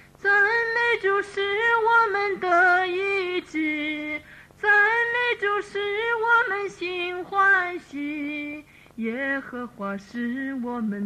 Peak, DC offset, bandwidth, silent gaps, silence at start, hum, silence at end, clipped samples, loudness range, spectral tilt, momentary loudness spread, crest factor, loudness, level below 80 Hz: -10 dBFS; under 0.1%; 13.5 kHz; none; 0.2 s; none; 0 s; under 0.1%; 5 LU; -4.5 dB/octave; 13 LU; 14 dB; -23 LUFS; -62 dBFS